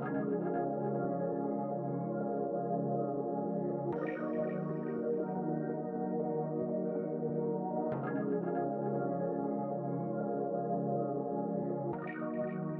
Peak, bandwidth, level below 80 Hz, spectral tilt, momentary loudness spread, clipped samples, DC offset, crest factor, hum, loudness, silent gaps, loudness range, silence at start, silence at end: -22 dBFS; 3.4 kHz; -78 dBFS; -10.5 dB/octave; 2 LU; under 0.1%; under 0.1%; 14 dB; none; -36 LUFS; none; 1 LU; 0 s; 0 s